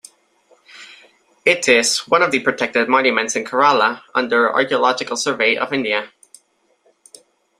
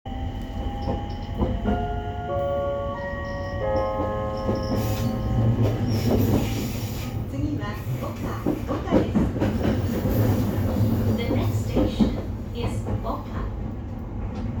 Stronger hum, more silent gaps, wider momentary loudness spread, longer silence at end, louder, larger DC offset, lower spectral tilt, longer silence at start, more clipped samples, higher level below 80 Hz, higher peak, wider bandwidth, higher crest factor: neither; neither; about the same, 7 LU vs 9 LU; first, 1.5 s vs 0 s; first, -16 LUFS vs -26 LUFS; neither; second, -2 dB/octave vs -7.5 dB/octave; first, 0.75 s vs 0.05 s; neither; second, -64 dBFS vs -34 dBFS; first, 0 dBFS vs -6 dBFS; second, 15 kHz vs over 20 kHz; about the same, 18 dB vs 18 dB